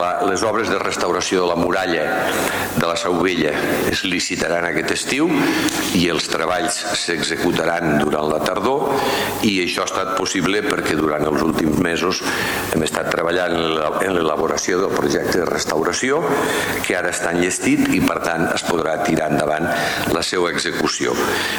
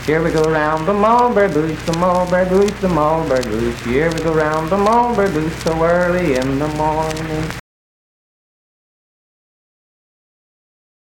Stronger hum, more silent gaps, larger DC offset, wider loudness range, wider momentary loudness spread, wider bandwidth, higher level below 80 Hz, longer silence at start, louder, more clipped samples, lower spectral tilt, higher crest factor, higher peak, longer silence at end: neither; neither; neither; second, 1 LU vs 10 LU; second, 2 LU vs 7 LU; first, 19 kHz vs 17 kHz; second, -46 dBFS vs -36 dBFS; about the same, 0 s vs 0 s; second, -19 LUFS vs -16 LUFS; neither; second, -3.5 dB/octave vs -6 dB/octave; about the same, 14 dB vs 14 dB; about the same, -4 dBFS vs -4 dBFS; second, 0 s vs 3.4 s